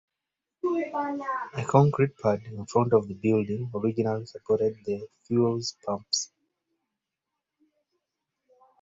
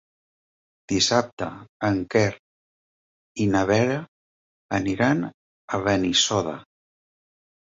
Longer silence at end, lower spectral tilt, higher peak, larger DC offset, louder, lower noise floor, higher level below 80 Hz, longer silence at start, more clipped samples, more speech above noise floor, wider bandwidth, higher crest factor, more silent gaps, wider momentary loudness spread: first, 2.55 s vs 1.1 s; first, -6 dB/octave vs -4 dB/octave; about the same, -6 dBFS vs -6 dBFS; neither; second, -27 LUFS vs -23 LUFS; about the same, -87 dBFS vs under -90 dBFS; second, -64 dBFS vs -52 dBFS; second, 0.65 s vs 0.9 s; neither; second, 61 dB vs over 67 dB; about the same, 8 kHz vs 8 kHz; about the same, 24 dB vs 20 dB; second, none vs 1.33-1.37 s, 1.69-1.80 s, 2.39-3.35 s, 4.08-4.69 s, 5.34-5.68 s; second, 10 LU vs 13 LU